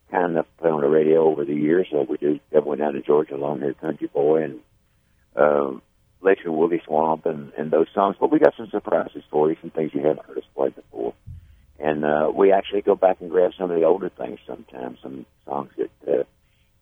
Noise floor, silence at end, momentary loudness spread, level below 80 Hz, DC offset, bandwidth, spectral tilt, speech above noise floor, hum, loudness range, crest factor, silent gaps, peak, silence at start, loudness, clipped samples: -62 dBFS; 0.6 s; 14 LU; -60 dBFS; under 0.1%; 3.8 kHz; -9 dB/octave; 41 dB; none; 4 LU; 22 dB; none; 0 dBFS; 0.1 s; -22 LUFS; under 0.1%